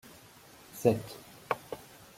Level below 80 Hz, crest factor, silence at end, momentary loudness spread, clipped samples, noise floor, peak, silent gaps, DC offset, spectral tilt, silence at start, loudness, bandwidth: -66 dBFS; 26 dB; 0.4 s; 24 LU; under 0.1%; -55 dBFS; -10 dBFS; none; under 0.1%; -6 dB/octave; 0.75 s; -32 LUFS; 16.5 kHz